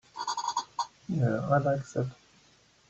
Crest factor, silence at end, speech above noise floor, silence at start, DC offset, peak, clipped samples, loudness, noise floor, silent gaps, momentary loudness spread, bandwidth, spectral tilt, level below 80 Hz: 20 dB; 0.75 s; 34 dB; 0.15 s; under 0.1%; -12 dBFS; under 0.1%; -31 LUFS; -63 dBFS; none; 10 LU; 8.2 kHz; -6 dB/octave; -64 dBFS